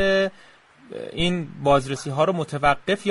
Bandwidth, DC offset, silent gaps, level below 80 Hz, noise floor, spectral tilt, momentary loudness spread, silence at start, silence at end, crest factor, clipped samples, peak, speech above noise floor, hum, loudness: 11.5 kHz; under 0.1%; none; -44 dBFS; -51 dBFS; -5.5 dB/octave; 11 LU; 0 s; 0 s; 18 dB; under 0.1%; -6 dBFS; 29 dB; none; -22 LUFS